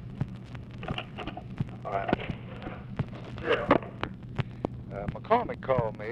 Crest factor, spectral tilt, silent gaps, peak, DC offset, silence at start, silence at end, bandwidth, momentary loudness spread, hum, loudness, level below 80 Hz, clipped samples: 24 dB; -8 dB/octave; none; -8 dBFS; under 0.1%; 0 s; 0 s; 9 kHz; 12 LU; none; -32 LUFS; -50 dBFS; under 0.1%